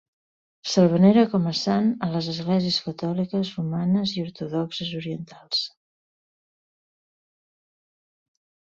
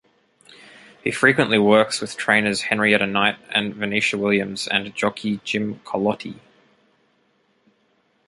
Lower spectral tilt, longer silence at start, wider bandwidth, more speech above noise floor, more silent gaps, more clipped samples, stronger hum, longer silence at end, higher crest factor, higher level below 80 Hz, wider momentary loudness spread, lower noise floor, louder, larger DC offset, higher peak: first, -6.5 dB/octave vs -4 dB/octave; second, 0.65 s vs 1.05 s; second, 7.6 kHz vs 11.5 kHz; first, over 67 dB vs 44 dB; neither; neither; neither; first, 3 s vs 1.95 s; about the same, 20 dB vs 22 dB; about the same, -64 dBFS vs -60 dBFS; first, 13 LU vs 10 LU; first, under -90 dBFS vs -64 dBFS; second, -23 LUFS vs -20 LUFS; neither; about the same, -4 dBFS vs -2 dBFS